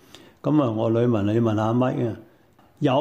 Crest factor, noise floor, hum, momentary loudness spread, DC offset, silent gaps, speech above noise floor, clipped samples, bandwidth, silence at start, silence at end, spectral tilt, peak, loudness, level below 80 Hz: 14 dB; -56 dBFS; none; 8 LU; under 0.1%; none; 35 dB; under 0.1%; 8.2 kHz; 0.45 s; 0 s; -8.5 dB/octave; -8 dBFS; -23 LUFS; -62 dBFS